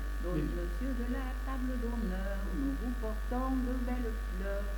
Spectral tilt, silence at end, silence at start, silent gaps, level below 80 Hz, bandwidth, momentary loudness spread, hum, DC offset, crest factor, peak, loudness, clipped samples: -7 dB/octave; 0 s; 0 s; none; -36 dBFS; 19 kHz; 3 LU; none; under 0.1%; 12 dB; -22 dBFS; -36 LUFS; under 0.1%